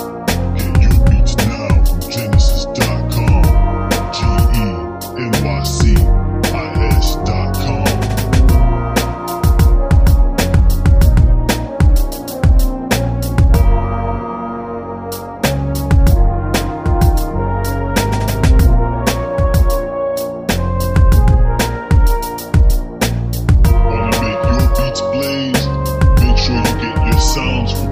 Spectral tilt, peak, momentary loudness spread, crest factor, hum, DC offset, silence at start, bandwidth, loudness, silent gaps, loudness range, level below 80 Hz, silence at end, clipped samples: -6 dB/octave; 0 dBFS; 7 LU; 12 dB; none; under 0.1%; 0 s; 15.5 kHz; -15 LUFS; none; 3 LU; -14 dBFS; 0 s; under 0.1%